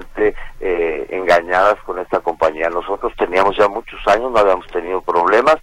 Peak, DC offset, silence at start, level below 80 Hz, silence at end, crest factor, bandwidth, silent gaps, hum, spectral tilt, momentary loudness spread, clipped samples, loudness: 0 dBFS; under 0.1%; 0 s; -38 dBFS; 0.05 s; 16 dB; 13 kHz; none; none; -4.5 dB/octave; 8 LU; under 0.1%; -17 LUFS